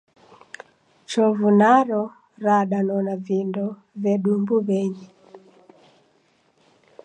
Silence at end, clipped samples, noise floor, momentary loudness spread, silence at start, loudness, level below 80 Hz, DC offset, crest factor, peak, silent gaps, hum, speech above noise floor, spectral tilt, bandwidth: 1.7 s; under 0.1%; -62 dBFS; 20 LU; 1.1 s; -21 LUFS; -76 dBFS; under 0.1%; 18 dB; -4 dBFS; none; none; 42 dB; -7 dB/octave; 9.4 kHz